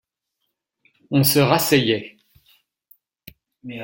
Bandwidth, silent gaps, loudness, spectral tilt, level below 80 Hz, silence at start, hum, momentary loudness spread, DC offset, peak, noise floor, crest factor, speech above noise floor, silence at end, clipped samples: 17 kHz; none; -18 LUFS; -4.5 dB/octave; -58 dBFS; 1.1 s; none; 23 LU; under 0.1%; -2 dBFS; -77 dBFS; 22 dB; 60 dB; 0 s; under 0.1%